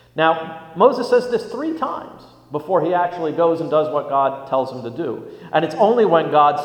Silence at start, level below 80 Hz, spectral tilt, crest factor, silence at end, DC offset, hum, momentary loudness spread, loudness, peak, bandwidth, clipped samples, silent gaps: 0.15 s; -64 dBFS; -6.5 dB/octave; 18 dB; 0 s; under 0.1%; none; 12 LU; -19 LUFS; 0 dBFS; 10 kHz; under 0.1%; none